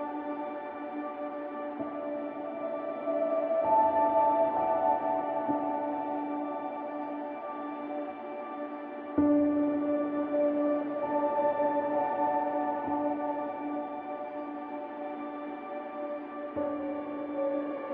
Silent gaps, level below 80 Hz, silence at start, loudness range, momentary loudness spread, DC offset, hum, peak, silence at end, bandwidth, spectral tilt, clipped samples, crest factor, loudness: none; -70 dBFS; 0 s; 9 LU; 12 LU; under 0.1%; none; -14 dBFS; 0 s; 4 kHz; -5.5 dB/octave; under 0.1%; 16 dB; -32 LUFS